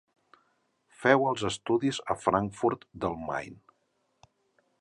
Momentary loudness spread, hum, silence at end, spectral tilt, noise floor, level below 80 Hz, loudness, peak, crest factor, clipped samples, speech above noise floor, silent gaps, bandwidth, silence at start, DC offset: 11 LU; none; 1.25 s; -5 dB/octave; -75 dBFS; -60 dBFS; -29 LUFS; -6 dBFS; 24 dB; under 0.1%; 46 dB; none; 11.5 kHz; 1 s; under 0.1%